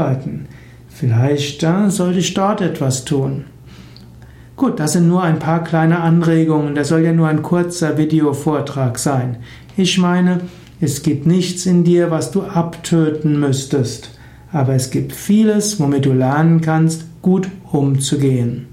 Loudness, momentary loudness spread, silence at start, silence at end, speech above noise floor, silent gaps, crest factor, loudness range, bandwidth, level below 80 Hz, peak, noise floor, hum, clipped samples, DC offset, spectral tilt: -16 LUFS; 8 LU; 0 s; 0.05 s; 24 dB; none; 12 dB; 3 LU; 16 kHz; -48 dBFS; -4 dBFS; -39 dBFS; none; under 0.1%; under 0.1%; -6 dB/octave